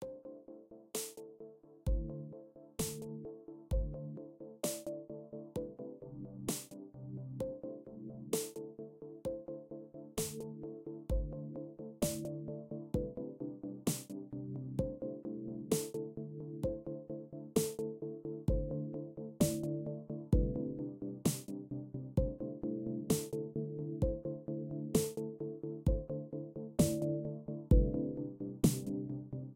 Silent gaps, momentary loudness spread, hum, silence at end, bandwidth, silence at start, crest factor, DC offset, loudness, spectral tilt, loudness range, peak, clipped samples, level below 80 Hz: none; 14 LU; none; 0 s; 16 kHz; 0 s; 22 dB; under 0.1%; -40 LUFS; -6 dB/octave; 7 LU; -16 dBFS; under 0.1%; -46 dBFS